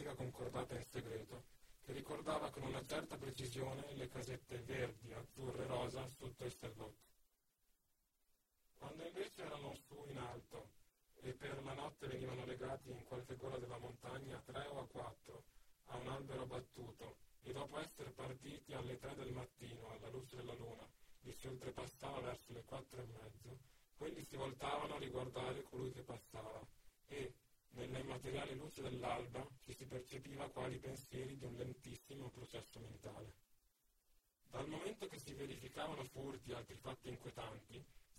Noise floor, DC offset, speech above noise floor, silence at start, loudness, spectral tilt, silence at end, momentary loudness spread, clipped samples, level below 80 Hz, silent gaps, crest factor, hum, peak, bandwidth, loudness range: -83 dBFS; under 0.1%; 33 dB; 0 s; -51 LUFS; -5.5 dB/octave; 0 s; 10 LU; under 0.1%; -70 dBFS; none; 22 dB; none; -30 dBFS; 16.5 kHz; 6 LU